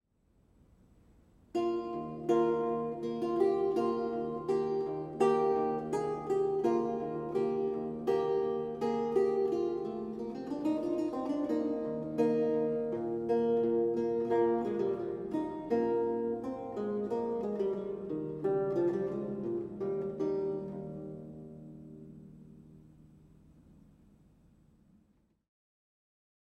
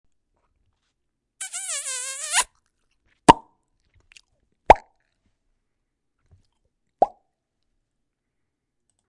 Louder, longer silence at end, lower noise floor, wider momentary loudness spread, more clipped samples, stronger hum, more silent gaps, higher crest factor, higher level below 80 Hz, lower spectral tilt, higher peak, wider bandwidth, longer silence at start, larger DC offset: second, -33 LUFS vs -21 LUFS; first, 3.45 s vs 2 s; second, -70 dBFS vs -79 dBFS; second, 10 LU vs 14 LU; neither; neither; neither; second, 18 dB vs 26 dB; second, -66 dBFS vs -48 dBFS; first, -8 dB/octave vs -3 dB/octave; second, -16 dBFS vs 0 dBFS; second, 10 kHz vs 11.5 kHz; first, 1.55 s vs 1.4 s; neither